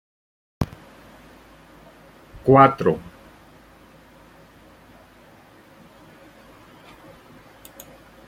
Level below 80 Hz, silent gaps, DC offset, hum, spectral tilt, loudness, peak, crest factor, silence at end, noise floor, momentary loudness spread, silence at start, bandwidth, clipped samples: -52 dBFS; none; under 0.1%; none; -8 dB/octave; -19 LUFS; -2 dBFS; 24 dB; 5.3 s; -50 dBFS; 32 LU; 0.6 s; 16.5 kHz; under 0.1%